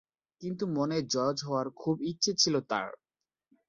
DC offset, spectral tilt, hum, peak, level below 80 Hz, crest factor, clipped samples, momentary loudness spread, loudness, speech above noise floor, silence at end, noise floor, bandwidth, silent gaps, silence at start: under 0.1%; -4 dB/octave; none; -12 dBFS; -72 dBFS; 20 dB; under 0.1%; 11 LU; -30 LUFS; over 59 dB; 0.75 s; under -90 dBFS; 7.8 kHz; none; 0.4 s